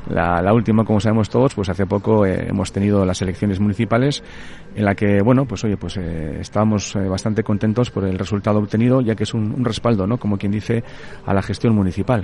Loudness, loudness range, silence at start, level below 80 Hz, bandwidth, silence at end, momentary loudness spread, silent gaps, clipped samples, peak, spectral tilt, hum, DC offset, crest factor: -19 LUFS; 2 LU; 0 s; -42 dBFS; 11 kHz; 0 s; 8 LU; none; under 0.1%; -2 dBFS; -7 dB/octave; none; under 0.1%; 16 dB